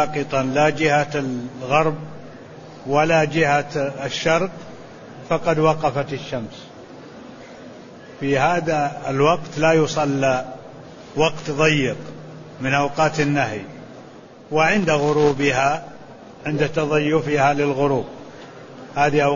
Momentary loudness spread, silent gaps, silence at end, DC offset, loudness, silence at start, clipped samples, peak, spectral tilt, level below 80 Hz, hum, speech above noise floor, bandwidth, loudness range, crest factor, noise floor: 22 LU; none; 0 s; under 0.1%; -20 LUFS; 0 s; under 0.1%; -4 dBFS; -5.5 dB/octave; -50 dBFS; none; 23 dB; 7.4 kHz; 4 LU; 18 dB; -42 dBFS